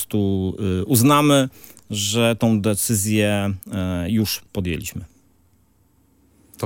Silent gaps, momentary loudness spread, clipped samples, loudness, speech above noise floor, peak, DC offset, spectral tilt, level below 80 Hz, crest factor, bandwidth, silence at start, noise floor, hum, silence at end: none; 11 LU; under 0.1%; -20 LUFS; 40 dB; -2 dBFS; under 0.1%; -5 dB/octave; -52 dBFS; 18 dB; 17 kHz; 0 s; -59 dBFS; none; 0 s